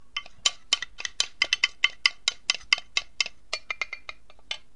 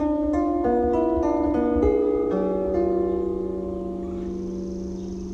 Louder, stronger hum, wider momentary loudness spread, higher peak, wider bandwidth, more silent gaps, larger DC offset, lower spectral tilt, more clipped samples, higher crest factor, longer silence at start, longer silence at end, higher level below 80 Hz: about the same, -26 LUFS vs -24 LUFS; neither; first, 13 LU vs 10 LU; first, 0 dBFS vs -8 dBFS; first, 11.5 kHz vs 7.4 kHz; neither; first, 0.6% vs under 0.1%; second, 2.5 dB/octave vs -9 dB/octave; neither; first, 30 dB vs 16 dB; first, 0.15 s vs 0 s; first, 0.2 s vs 0 s; second, -60 dBFS vs -38 dBFS